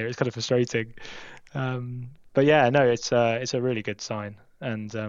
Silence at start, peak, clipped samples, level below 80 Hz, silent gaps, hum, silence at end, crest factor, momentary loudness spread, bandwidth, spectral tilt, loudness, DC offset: 0 s; -6 dBFS; under 0.1%; -60 dBFS; none; none; 0 s; 20 dB; 19 LU; 7.6 kHz; -5.5 dB/octave; -25 LUFS; under 0.1%